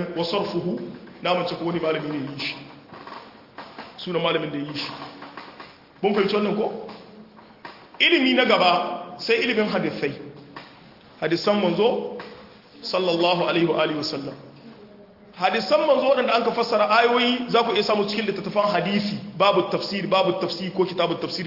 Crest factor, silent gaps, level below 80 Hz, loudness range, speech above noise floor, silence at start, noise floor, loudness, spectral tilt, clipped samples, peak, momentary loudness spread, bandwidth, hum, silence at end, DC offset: 18 dB; none; -66 dBFS; 8 LU; 26 dB; 0 s; -48 dBFS; -22 LUFS; -5.5 dB/octave; under 0.1%; -4 dBFS; 22 LU; 5.8 kHz; none; 0 s; under 0.1%